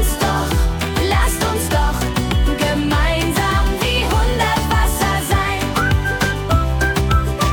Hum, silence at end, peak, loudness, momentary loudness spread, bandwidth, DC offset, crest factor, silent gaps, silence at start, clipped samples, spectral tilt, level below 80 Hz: none; 0 s; -4 dBFS; -17 LUFS; 2 LU; 18 kHz; under 0.1%; 12 dB; none; 0 s; under 0.1%; -4.5 dB/octave; -20 dBFS